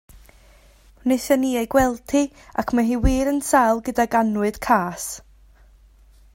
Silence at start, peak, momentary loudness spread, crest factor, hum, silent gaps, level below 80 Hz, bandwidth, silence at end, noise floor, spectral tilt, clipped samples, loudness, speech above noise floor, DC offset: 0.15 s; -2 dBFS; 10 LU; 18 dB; none; none; -36 dBFS; 16.5 kHz; 1.15 s; -51 dBFS; -5 dB/octave; under 0.1%; -21 LUFS; 31 dB; under 0.1%